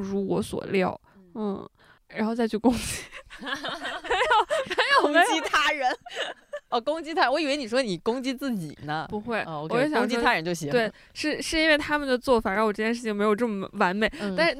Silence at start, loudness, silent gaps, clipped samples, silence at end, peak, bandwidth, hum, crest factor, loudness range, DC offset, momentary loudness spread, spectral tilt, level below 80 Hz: 0 s; -25 LUFS; none; under 0.1%; 0 s; -8 dBFS; 16 kHz; none; 18 dB; 5 LU; under 0.1%; 11 LU; -4 dB/octave; -52 dBFS